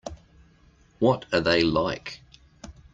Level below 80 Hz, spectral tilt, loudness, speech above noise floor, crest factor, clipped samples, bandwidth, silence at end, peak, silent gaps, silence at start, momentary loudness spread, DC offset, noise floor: -50 dBFS; -6 dB/octave; -24 LUFS; 34 dB; 20 dB; under 0.1%; 7.8 kHz; 0.2 s; -8 dBFS; none; 0.05 s; 20 LU; under 0.1%; -58 dBFS